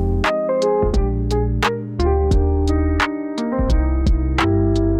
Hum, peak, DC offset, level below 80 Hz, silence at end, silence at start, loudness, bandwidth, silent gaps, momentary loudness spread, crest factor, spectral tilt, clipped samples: none; -6 dBFS; under 0.1%; -22 dBFS; 0 s; 0 s; -19 LUFS; 10.5 kHz; none; 4 LU; 12 dB; -7 dB/octave; under 0.1%